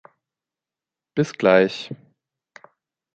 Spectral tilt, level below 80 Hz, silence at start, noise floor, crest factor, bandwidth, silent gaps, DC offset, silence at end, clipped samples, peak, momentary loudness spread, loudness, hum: -6 dB/octave; -66 dBFS; 1.15 s; -89 dBFS; 22 dB; 8.4 kHz; none; under 0.1%; 1.2 s; under 0.1%; -2 dBFS; 20 LU; -20 LUFS; none